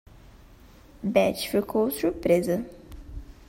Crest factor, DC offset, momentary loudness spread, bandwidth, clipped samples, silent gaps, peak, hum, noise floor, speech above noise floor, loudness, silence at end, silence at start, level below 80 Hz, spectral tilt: 20 dB; under 0.1%; 20 LU; 16.5 kHz; under 0.1%; none; -6 dBFS; none; -51 dBFS; 27 dB; -25 LUFS; 0.05 s; 0.25 s; -48 dBFS; -5.5 dB/octave